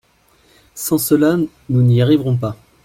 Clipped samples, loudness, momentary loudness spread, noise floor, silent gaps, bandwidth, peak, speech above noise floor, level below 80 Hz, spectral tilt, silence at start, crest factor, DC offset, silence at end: under 0.1%; -16 LUFS; 8 LU; -55 dBFS; none; 16.5 kHz; -2 dBFS; 40 dB; -50 dBFS; -6.5 dB/octave; 0.75 s; 14 dB; under 0.1%; 0.3 s